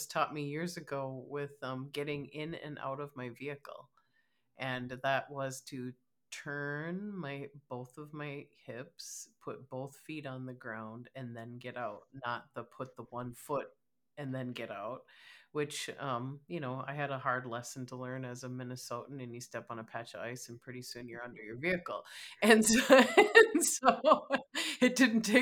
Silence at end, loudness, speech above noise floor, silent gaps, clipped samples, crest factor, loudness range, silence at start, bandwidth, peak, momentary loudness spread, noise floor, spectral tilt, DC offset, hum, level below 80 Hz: 0 s; -33 LUFS; 44 dB; none; under 0.1%; 28 dB; 18 LU; 0 s; 19 kHz; -8 dBFS; 20 LU; -78 dBFS; -3.5 dB/octave; under 0.1%; none; -72 dBFS